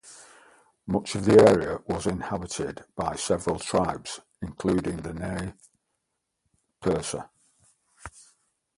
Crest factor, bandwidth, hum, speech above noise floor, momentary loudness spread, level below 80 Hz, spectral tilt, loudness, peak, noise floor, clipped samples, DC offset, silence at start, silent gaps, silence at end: 24 dB; 11.5 kHz; none; 55 dB; 20 LU; -50 dBFS; -5.5 dB/octave; -26 LUFS; -4 dBFS; -80 dBFS; under 0.1%; under 0.1%; 0.05 s; none; 0.7 s